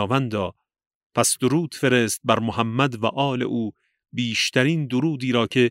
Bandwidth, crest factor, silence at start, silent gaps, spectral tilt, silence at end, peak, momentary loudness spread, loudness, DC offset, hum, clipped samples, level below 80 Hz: 16 kHz; 20 dB; 0 s; 0.95-1.10 s; -4.5 dB/octave; 0 s; -2 dBFS; 9 LU; -22 LUFS; under 0.1%; none; under 0.1%; -62 dBFS